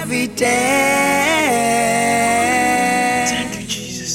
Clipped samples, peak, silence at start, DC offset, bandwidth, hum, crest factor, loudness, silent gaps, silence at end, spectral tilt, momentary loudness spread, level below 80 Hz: under 0.1%; -4 dBFS; 0 s; under 0.1%; 16.5 kHz; none; 14 dB; -16 LUFS; none; 0 s; -2.5 dB/octave; 8 LU; -48 dBFS